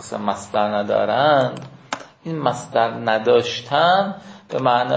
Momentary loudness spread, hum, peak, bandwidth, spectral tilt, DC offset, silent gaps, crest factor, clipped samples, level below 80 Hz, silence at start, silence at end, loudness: 15 LU; none; -2 dBFS; 8 kHz; -5 dB/octave; under 0.1%; none; 16 dB; under 0.1%; -62 dBFS; 0 s; 0 s; -19 LUFS